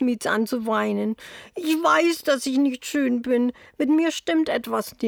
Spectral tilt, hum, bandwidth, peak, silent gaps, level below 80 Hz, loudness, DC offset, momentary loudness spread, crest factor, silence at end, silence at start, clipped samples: -4 dB/octave; none; 20 kHz; -6 dBFS; none; -64 dBFS; -23 LUFS; under 0.1%; 8 LU; 16 dB; 0 s; 0 s; under 0.1%